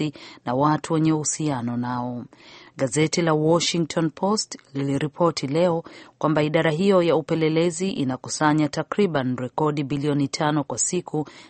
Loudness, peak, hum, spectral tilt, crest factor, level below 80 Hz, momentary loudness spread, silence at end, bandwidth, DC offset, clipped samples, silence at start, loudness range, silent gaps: -23 LUFS; -4 dBFS; none; -5 dB/octave; 18 dB; -60 dBFS; 9 LU; 0.05 s; 8.8 kHz; under 0.1%; under 0.1%; 0 s; 2 LU; none